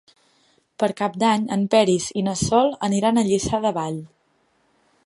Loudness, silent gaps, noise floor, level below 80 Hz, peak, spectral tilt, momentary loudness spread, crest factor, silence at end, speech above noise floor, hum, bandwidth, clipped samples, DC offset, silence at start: -21 LUFS; none; -65 dBFS; -50 dBFS; -4 dBFS; -5 dB/octave; 7 LU; 18 dB; 1 s; 45 dB; none; 11.5 kHz; under 0.1%; under 0.1%; 0.8 s